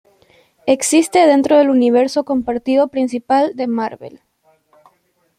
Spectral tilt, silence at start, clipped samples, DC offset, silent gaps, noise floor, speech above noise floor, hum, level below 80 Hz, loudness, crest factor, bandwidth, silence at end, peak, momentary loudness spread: -3.5 dB/octave; 0.65 s; under 0.1%; under 0.1%; none; -61 dBFS; 47 dB; none; -58 dBFS; -15 LUFS; 14 dB; 14 kHz; 1.3 s; -2 dBFS; 9 LU